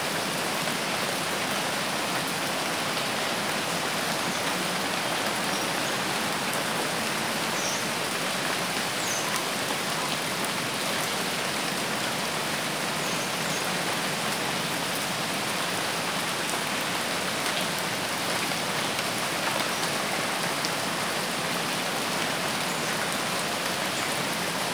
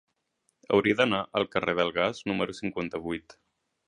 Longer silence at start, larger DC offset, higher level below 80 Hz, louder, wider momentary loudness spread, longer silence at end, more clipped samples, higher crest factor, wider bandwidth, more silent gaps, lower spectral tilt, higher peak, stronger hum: second, 0 s vs 0.7 s; neither; second, -66 dBFS vs -60 dBFS; about the same, -27 LUFS vs -28 LUFS; second, 1 LU vs 10 LU; second, 0 s vs 0.55 s; neither; about the same, 20 dB vs 22 dB; first, over 20 kHz vs 10.5 kHz; neither; second, -2 dB/octave vs -5.5 dB/octave; about the same, -8 dBFS vs -8 dBFS; neither